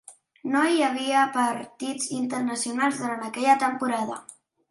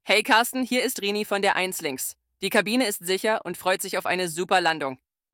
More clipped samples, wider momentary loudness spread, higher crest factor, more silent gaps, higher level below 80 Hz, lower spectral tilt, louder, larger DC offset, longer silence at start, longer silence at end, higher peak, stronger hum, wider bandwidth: neither; about the same, 11 LU vs 9 LU; about the same, 18 dB vs 22 dB; neither; about the same, -76 dBFS vs -72 dBFS; about the same, -3 dB/octave vs -2.5 dB/octave; about the same, -25 LUFS vs -24 LUFS; neither; about the same, 0.1 s vs 0.05 s; about the same, 0.35 s vs 0.4 s; about the same, -6 dBFS vs -4 dBFS; neither; second, 12 kHz vs 18 kHz